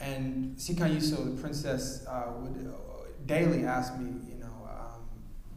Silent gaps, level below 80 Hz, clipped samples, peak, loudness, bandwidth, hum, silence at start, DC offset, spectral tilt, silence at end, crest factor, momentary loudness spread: none; -44 dBFS; under 0.1%; -16 dBFS; -33 LUFS; 15.5 kHz; none; 0 s; under 0.1%; -5.5 dB/octave; 0 s; 18 dB; 17 LU